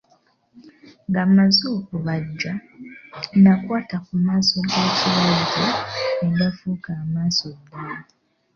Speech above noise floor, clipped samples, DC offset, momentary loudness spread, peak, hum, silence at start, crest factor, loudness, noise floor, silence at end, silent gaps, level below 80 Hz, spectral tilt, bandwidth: 41 dB; under 0.1%; under 0.1%; 18 LU; -4 dBFS; none; 0.55 s; 18 dB; -20 LUFS; -61 dBFS; 0.55 s; none; -56 dBFS; -5.5 dB/octave; 7 kHz